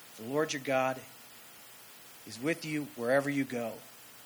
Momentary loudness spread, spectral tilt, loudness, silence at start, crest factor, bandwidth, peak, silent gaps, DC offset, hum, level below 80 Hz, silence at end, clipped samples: 19 LU; -4.5 dB/octave; -33 LUFS; 0 s; 20 dB; over 20 kHz; -14 dBFS; none; under 0.1%; none; -80 dBFS; 0 s; under 0.1%